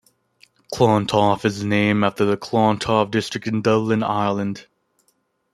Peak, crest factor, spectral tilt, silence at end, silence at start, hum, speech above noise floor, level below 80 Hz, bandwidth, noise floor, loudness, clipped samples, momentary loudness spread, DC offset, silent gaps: -2 dBFS; 18 dB; -6 dB/octave; 0.9 s; 0.7 s; none; 48 dB; -56 dBFS; 13 kHz; -67 dBFS; -20 LUFS; under 0.1%; 7 LU; under 0.1%; none